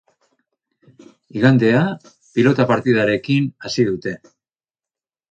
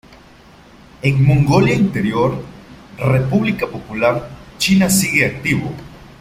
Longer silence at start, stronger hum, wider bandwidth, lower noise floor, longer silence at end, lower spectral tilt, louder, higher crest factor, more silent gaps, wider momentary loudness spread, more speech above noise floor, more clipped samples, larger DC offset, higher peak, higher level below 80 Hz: first, 1.35 s vs 1.05 s; neither; second, 8.6 kHz vs 16 kHz; first, under -90 dBFS vs -44 dBFS; first, 1.15 s vs 0.15 s; first, -7 dB/octave vs -5.5 dB/octave; about the same, -17 LUFS vs -16 LUFS; about the same, 18 dB vs 16 dB; neither; about the same, 14 LU vs 13 LU; first, over 73 dB vs 29 dB; neither; neither; about the same, -2 dBFS vs -2 dBFS; second, -58 dBFS vs -42 dBFS